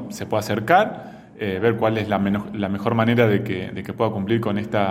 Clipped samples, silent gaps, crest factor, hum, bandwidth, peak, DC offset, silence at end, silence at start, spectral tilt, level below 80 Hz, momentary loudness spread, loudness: under 0.1%; none; 20 dB; none; 16.5 kHz; -2 dBFS; under 0.1%; 0 s; 0 s; -7 dB/octave; -56 dBFS; 10 LU; -21 LUFS